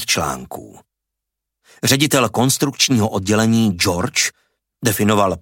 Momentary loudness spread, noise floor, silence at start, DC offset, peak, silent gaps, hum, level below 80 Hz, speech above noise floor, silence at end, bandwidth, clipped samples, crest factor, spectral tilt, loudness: 8 LU; -81 dBFS; 0 s; under 0.1%; -2 dBFS; none; none; -48 dBFS; 64 dB; 0 s; 17 kHz; under 0.1%; 16 dB; -4 dB/octave; -17 LUFS